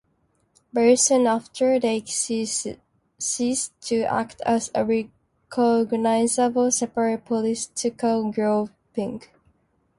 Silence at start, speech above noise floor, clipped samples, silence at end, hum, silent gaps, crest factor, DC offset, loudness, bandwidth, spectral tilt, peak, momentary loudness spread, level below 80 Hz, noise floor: 0.75 s; 45 dB; under 0.1%; 0.8 s; none; none; 16 dB; under 0.1%; -23 LUFS; 11.5 kHz; -3.5 dB/octave; -6 dBFS; 11 LU; -62 dBFS; -67 dBFS